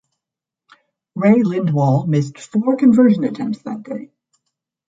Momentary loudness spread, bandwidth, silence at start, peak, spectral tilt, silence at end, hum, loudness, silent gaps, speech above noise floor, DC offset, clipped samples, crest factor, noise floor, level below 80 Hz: 16 LU; 7.8 kHz; 1.15 s; -2 dBFS; -8.5 dB/octave; 0.85 s; none; -16 LUFS; none; 70 dB; under 0.1%; under 0.1%; 16 dB; -86 dBFS; -62 dBFS